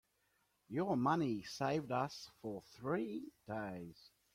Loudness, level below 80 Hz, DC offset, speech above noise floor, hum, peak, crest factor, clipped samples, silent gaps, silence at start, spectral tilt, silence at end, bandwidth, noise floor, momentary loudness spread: -40 LUFS; -74 dBFS; under 0.1%; 39 dB; none; -22 dBFS; 20 dB; under 0.1%; none; 0.7 s; -6.5 dB/octave; 0.25 s; 16 kHz; -80 dBFS; 13 LU